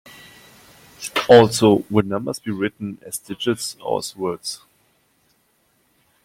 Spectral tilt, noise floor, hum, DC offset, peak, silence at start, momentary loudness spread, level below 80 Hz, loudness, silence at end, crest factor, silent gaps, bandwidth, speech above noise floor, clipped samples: -5 dB/octave; -64 dBFS; none; under 0.1%; -2 dBFS; 1 s; 19 LU; -58 dBFS; -19 LUFS; 1.7 s; 20 dB; none; 16.5 kHz; 45 dB; under 0.1%